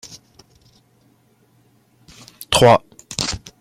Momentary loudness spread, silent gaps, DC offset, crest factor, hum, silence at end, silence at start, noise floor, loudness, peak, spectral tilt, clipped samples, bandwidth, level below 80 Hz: 25 LU; none; under 0.1%; 22 dB; none; 0.25 s; 2.5 s; -57 dBFS; -17 LUFS; 0 dBFS; -4 dB/octave; under 0.1%; 16.5 kHz; -46 dBFS